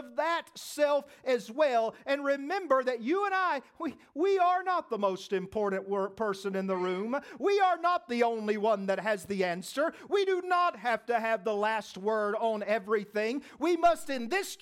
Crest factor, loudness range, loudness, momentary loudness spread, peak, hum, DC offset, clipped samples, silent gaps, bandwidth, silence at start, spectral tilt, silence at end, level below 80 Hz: 16 dB; 1 LU; -30 LUFS; 6 LU; -12 dBFS; none; under 0.1%; under 0.1%; none; 16 kHz; 0 s; -4.5 dB/octave; 0.05 s; -68 dBFS